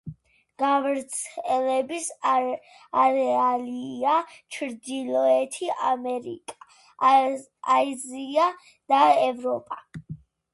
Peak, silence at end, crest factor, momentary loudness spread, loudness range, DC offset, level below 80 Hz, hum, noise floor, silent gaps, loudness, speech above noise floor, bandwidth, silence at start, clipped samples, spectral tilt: -6 dBFS; 0.4 s; 18 dB; 18 LU; 3 LU; under 0.1%; -68 dBFS; none; -50 dBFS; none; -24 LUFS; 26 dB; 11.5 kHz; 0.05 s; under 0.1%; -3.5 dB/octave